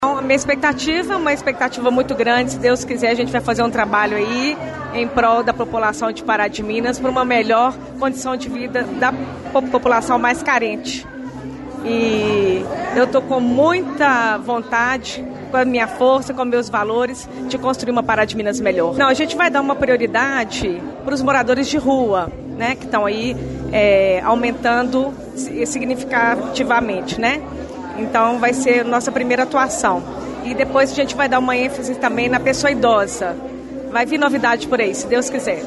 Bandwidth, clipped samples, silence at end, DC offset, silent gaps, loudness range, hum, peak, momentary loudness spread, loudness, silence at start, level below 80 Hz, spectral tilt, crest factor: 11.5 kHz; under 0.1%; 0 s; under 0.1%; none; 2 LU; none; -4 dBFS; 9 LU; -17 LUFS; 0 s; -44 dBFS; -4 dB/octave; 14 dB